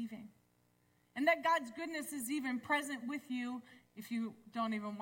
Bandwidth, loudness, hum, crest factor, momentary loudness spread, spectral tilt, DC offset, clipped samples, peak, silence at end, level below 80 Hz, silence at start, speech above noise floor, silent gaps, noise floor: 17 kHz; -38 LUFS; 60 Hz at -65 dBFS; 20 dB; 16 LU; -3.5 dB/octave; under 0.1%; under 0.1%; -18 dBFS; 0 s; -84 dBFS; 0 s; 36 dB; none; -74 dBFS